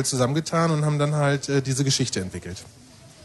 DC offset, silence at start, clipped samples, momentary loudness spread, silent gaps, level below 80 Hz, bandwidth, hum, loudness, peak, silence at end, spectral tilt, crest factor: under 0.1%; 0 s; under 0.1%; 13 LU; none; -52 dBFS; 12.5 kHz; none; -23 LUFS; -8 dBFS; 0.15 s; -5 dB/octave; 16 dB